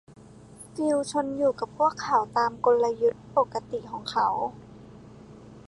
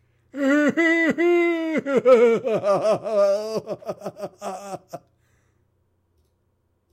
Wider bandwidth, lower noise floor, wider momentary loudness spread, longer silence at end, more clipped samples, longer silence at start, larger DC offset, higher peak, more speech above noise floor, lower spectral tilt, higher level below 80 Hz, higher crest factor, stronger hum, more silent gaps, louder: second, 11.5 kHz vs 14 kHz; second, -48 dBFS vs -69 dBFS; second, 11 LU vs 19 LU; second, 0.1 s vs 1.95 s; neither; second, 0.1 s vs 0.35 s; neither; second, -10 dBFS vs -6 dBFS; second, 22 dB vs 48 dB; about the same, -5 dB/octave vs -5.5 dB/octave; first, -60 dBFS vs -70 dBFS; about the same, 18 dB vs 18 dB; neither; neither; second, -26 LUFS vs -20 LUFS